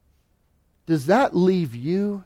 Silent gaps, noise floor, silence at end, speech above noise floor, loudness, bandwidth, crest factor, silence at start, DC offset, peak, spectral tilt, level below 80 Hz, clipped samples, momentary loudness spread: none; -65 dBFS; 0.05 s; 44 dB; -21 LUFS; 15 kHz; 16 dB; 0.9 s; under 0.1%; -8 dBFS; -7.5 dB/octave; -60 dBFS; under 0.1%; 7 LU